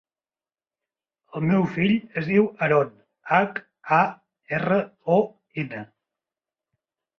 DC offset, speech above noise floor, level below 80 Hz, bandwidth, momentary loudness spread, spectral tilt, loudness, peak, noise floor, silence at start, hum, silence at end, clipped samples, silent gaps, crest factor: under 0.1%; over 68 dB; -64 dBFS; 6.4 kHz; 11 LU; -8.5 dB/octave; -23 LUFS; -6 dBFS; under -90 dBFS; 1.35 s; none; 1.35 s; under 0.1%; none; 20 dB